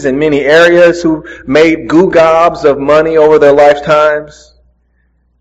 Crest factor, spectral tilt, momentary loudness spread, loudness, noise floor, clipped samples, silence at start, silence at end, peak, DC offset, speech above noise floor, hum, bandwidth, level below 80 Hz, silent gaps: 8 dB; -5.5 dB/octave; 7 LU; -7 LUFS; -54 dBFS; 2%; 0 s; 1.15 s; 0 dBFS; under 0.1%; 47 dB; none; 9.2 kHz; -40 dBFS; none